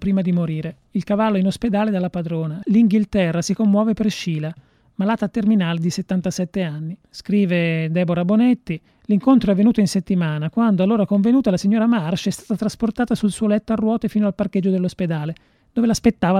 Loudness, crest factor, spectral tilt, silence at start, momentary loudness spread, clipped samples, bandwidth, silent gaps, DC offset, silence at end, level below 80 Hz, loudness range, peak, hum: -19 LUFS; 16 dB; -7 dB/octave; 0 s; 9 LU; under 0.1%; 13 kHz; none; under 0.1%; 0 s; -48 dBFS; 3 LU; -4 dBFS; none